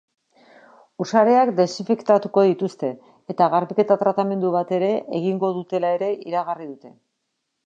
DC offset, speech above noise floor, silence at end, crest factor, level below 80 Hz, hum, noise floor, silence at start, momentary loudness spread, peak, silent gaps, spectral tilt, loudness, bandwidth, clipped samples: under 0.1%; 56 dB; 0.75 s; 18 dB; -76 dBFS; none; -76 dBFS; 1 s; 13 LU; -2 dBFS; none; -7 dB/octave; -21 LUFS; 7.8 kHz; under 0.1%